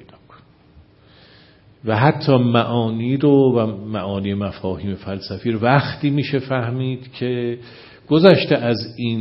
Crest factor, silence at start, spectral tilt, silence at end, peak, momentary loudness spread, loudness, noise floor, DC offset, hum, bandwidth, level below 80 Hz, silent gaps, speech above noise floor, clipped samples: 20 dB; 1.85 s; -10 dB/octave; 0 s; 0 dBFS; 12 LU; -19 LUFS; -49 dBFS; under 0.1%; none; 5.8 kHz; -54 dBFS; none; 32 dB; under 0.1%